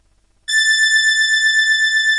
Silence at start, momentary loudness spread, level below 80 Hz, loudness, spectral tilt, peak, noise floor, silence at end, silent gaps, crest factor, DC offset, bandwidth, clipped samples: 0.5 s; 5 LU; -60 dBFS; -12 LUFS; 6 dB/octave; -6 dBFS; -35 dBFS; 0 s; none; 10 dB; under 0.1%; 11.5 kHz; under 0.1%